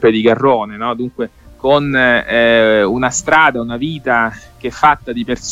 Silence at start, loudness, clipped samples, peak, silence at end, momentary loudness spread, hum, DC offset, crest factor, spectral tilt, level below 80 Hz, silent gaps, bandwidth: 0 s; -13 LUFS; under 0.1%; 0 dBFS; 0 s; 10 LU; none; under 0.1%; 14 dB; -4 dB/octave; -42 dBFS; none; 11 kHz